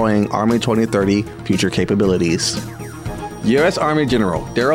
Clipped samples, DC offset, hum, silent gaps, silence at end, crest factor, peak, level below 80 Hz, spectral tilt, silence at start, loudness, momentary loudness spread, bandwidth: under 0.1%; under 0.1%; none; none; 0 s; 12 dB; -4 dBFS; -40 dBFS; -5.5 dB/octave; 0 s; -17 LUFS; 12 LU; 16.5 kHz